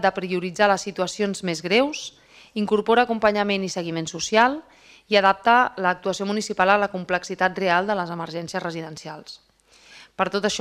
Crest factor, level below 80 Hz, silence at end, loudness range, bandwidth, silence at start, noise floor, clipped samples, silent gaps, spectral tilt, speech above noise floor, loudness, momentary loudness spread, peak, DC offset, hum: 22 dB; -60 dBFS; 0 s; 5 LU; 14 kHz; 0 s; -53 dBFS; under 0.1%; none; -4 dB/octave; 31 dB; -22 LUFS; 15 LU; -2 dBFS; under 0.1%; none